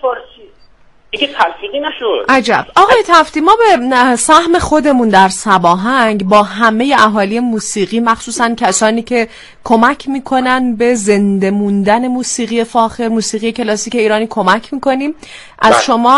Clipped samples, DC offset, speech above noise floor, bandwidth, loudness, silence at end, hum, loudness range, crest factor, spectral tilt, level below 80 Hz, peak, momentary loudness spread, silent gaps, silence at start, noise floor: 0.2%; under 0.1%; 32 dB; 12 kHz; -11 LUFS; 0 s; none; 5 LU; 12 dB; -4 dB/octave; -42 dBFS; 0 dBFS; 8 LU; none; 0.05 s; -43 dBFS